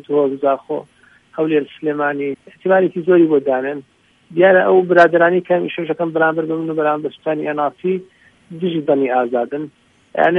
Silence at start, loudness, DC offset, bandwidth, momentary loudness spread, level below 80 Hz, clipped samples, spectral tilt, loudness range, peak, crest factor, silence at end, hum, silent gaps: 0.1 s; -17 LUFS; under 0.1%; 6.2 kHz; 14 LU; -66 dBFS; under 0.1%; -8 dB/octave; 6 LU; 0 dBFS; 16 dB; 0 s; none; none